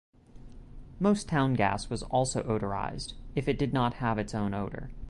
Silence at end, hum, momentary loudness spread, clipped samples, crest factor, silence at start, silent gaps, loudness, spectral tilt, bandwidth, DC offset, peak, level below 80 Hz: 0 s; none; 9 LU; under 0.1%; 18 dB; 0.35 s; none; -30 LUFS; -6 dB/octave; 11.5 kHz; under 0.1%; -12 dBFS; -46 dBFS